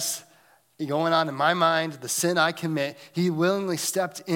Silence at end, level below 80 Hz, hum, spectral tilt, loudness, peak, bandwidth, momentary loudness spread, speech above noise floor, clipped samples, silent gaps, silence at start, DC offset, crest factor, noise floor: 0 s; -76 dBFS; none; -4 dB/octave; -25 LUFS; -8 dBFS; 17 kHz; 8 LU; 35 dB; under 0.1%; none; 0 s; under 0.1%; 18 dB; -59 dBFS